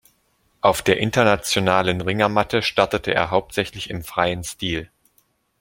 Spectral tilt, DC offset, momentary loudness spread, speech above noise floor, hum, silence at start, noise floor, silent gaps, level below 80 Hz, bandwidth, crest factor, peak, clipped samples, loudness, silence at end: -4.5 dB/octave; under 0.1%; 9 LU; 44 dB; none; 0.65 s; -64 dBFS; none; -48 dBFS; 17 kHz; 20 dB; -2 dBFS; under 0.1%; -20 LUFS; 0.75 s